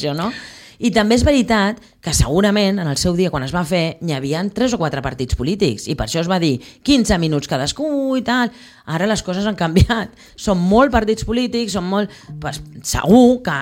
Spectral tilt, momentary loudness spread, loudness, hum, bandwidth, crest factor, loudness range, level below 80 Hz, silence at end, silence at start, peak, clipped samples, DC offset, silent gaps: -5 dB/octave; 10 LU; -17 LUFS; none; 16.5 kHz; 16 dB; 3 LU; -32 dBFS; 0 s; 0 s; -2 dBFS; under 0.1%; under 0.1%; none